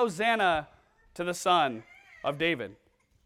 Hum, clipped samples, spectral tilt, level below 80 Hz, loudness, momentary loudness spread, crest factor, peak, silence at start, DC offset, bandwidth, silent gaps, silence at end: none; under 0.1%; -3.5 dB/octave; -62 dBFS; -28 LUFS; 15 LU; 18 dB; -12 dBFS; 0 s; under 0.1%; 15.5 kHz; none; 0.5 s